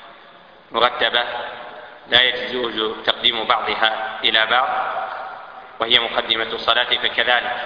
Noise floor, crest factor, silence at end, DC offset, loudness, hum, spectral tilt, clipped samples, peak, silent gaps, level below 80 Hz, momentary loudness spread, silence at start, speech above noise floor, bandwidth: -46 dBFS; 20 dB; 0 s; under 0.1%; -18 LUFS; none; -4 dB/octave; under 0.1%; 0 dBFS; none; -56 dBFS; 16 LU; 0 s; 26 dB; 5.2 kHz